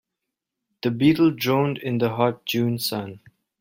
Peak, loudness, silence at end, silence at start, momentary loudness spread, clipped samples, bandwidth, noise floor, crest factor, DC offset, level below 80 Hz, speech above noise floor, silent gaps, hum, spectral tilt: -6 dBFS; -22 LUFS; 0.45 s; 0.85 s; 10 LU; under 0.1%; 16.5 kHz; -84 dBFS; 18 dB; under 0.1%; -62 dBFS; 62 dB; none; none; -6 dB/octave